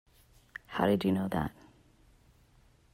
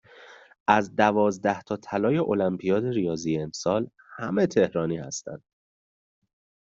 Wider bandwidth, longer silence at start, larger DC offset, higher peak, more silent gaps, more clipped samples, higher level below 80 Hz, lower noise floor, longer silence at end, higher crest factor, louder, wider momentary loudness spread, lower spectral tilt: first, 16 kHz vs 7.8 kHz; first, 0.7 s vs 0.2 s; neither; second, -14 dBFS vs -4 dBFS; second, none vs 0.60-0.66 s; neither; first, -58 dBFS vs -64 dBFS; first, -64 dBFS vs -50 dBFS; about the same, 1.4 s vs 1.35 s; about the same, 20 dB vs 22 dB; second, -31 LUFS vs -25 LUFS; first, 19 LU vs 13 LU; first, -7.5 dB/octave vs -5.5 dB/octave